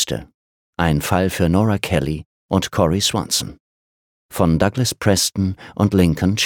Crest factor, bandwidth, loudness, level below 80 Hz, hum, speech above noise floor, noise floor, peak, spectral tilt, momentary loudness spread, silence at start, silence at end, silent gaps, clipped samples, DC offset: 18 dB; 19 kHz; -18 LUFS; -38 dBFS; none; over 72 dB; under -90 dBFS; -2 dBFS; -4.5 dB/octave; 9 LU; 0 s; 0 s; 0.34-0.73 s, 2.25-2.49 s, 3.60-4.29 s; under 0.1%; under 0.1%